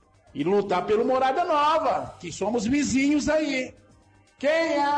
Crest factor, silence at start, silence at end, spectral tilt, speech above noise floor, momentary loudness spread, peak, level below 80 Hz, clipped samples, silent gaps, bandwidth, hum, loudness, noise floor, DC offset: 10 dB; 0.35 s; 0 s; -4.5 dB/octave; 34 dB; 9 LU; -14 dBFS; -54 dBFS; under 0.1%; none; 10 kHz; none; -24 LUFS; -57 dBFS; under 0.1%